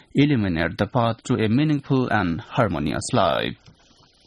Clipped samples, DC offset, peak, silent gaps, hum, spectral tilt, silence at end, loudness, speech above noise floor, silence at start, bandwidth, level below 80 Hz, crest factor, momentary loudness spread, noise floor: under 0.1%; under 0.1%; -4 dBFS; none; none; -6 dB/octave; 0.7 s; -22 LUFS; 34 dB; 0.15 s; 12 kHz; -46 dBFS; 18 dB; 4 LU; -56 dBFS